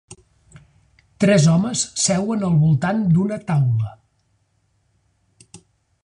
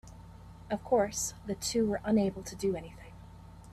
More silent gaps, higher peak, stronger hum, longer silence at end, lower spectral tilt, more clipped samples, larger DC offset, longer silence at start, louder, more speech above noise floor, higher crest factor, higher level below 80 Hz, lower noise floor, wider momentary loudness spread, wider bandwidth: neither; first, -4 dBFS vs -16 dBFS; neither; first, 0.45 s vs 0 s; about the same, -5.5 dB/octave vs -4.5 dB/octave; neither; neither; about the same, 0.1 s vs 0.05 s; first, -18 LUFS vs -32 LUFS; first, 48 dB vs 19 dB; about the same, 16 dB vs 18 dB; about the same, -50 dBFS vs -54 dBFS; first, -65 dBFS vs -50 dBFS; second, 6 LU vs 23 LU; second, 11 kHz vs 14.5 kHz